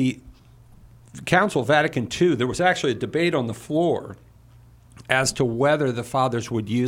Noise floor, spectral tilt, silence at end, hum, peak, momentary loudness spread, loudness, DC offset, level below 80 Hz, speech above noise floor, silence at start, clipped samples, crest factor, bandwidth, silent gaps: -50 dBFS; -5 dB/octave; 0 s; none; -2 dBFS; 7 LU; -22 LUFS; under 0.1%; -52 dBFS; 28 dB; 0 s; under 0.1%; 22 dB; 16 kHz; none